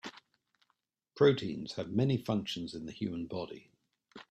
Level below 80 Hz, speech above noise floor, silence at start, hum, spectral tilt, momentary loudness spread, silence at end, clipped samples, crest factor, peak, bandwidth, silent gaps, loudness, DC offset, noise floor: -68 dBFS; 48 dB; 0.05 s; none; -7 dB/octave; 16 LU; 0.1 s; under 0.1%; 20 dB; -14 dBFS; 12.5 kHz; none; -33 LUFS; under 0.1%; -80 dBFS